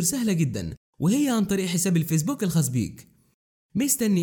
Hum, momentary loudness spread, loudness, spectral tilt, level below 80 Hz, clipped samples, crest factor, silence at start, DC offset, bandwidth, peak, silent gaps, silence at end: none; 9 LU; -24 LUFS; -5 dB/octave; -54 dBFS; under 0.1%; 16 dB; 0 s; under 0.1%; over 20 kHz; -8 dBFS; 0.77-0.93 s, 3.34-3.69 s; 0 s